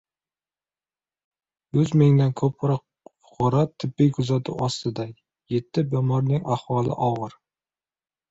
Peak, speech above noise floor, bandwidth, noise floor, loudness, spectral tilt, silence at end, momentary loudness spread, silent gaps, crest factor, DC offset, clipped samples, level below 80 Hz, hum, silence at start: -6 dBFS; over 68 dB; 8 kHz; under -90 dBFS; -23 LUFS; -8 dB/octave; 1 s; 11 LU; none; 18 dB; under 0.1%; under 0.1%; -58 dBFS; none; 1.75 s